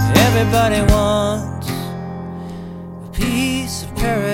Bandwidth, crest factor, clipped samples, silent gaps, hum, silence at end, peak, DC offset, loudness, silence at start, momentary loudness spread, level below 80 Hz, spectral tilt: 17 kHz; 18 dB; under 0.1%; none; none; 0 s; 0 dBFS; under 0.1%; -18 LUFS; 0 s; 16 LU; -28 dBFS; -5.5 dB/octave